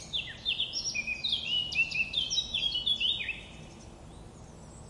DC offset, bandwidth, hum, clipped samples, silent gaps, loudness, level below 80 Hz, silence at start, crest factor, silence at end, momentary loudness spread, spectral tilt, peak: under 0.1%; 11.5 kHz; none; under 0.1%; none; -29 LUFS; -54 dBFS; 0 s; 16 dB; 0 s; 22 LU; -0.5 dB/octave; -18 dBFS